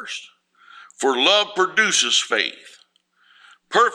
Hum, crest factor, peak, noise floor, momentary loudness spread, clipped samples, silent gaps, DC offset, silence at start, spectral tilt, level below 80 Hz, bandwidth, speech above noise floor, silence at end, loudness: none; 20 dB; -2 dBFS; -60 dBFS; 10 LU; under 0.1%; none; under 0.1%; 0 s; 0 dB/octave; -78 dBFS; 15.5 kHz; 40 dB; 0 s; -18 LUFS